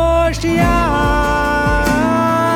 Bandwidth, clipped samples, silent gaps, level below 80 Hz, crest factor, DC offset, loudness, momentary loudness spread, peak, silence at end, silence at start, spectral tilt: 17.5 kHz; under 0.1%; none; -22 dBFS; 12 dB; under 0.1%; -14 LUFS; 1 LU; -2 dBFS; 0 s; 0 s; -6 dB/octave